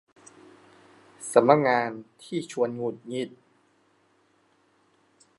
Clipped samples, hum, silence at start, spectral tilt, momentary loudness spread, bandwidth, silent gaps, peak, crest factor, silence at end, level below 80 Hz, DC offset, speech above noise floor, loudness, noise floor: under 0.1%; none; 1.2 s; -5.5 dB/octave; 17 LU; 11.5 kHz; none; -2 dBFS; 26 dB; 2.1 s; -78 dBFS; under 0.1%; 41 dB; -25 LUFS; -65 dBFS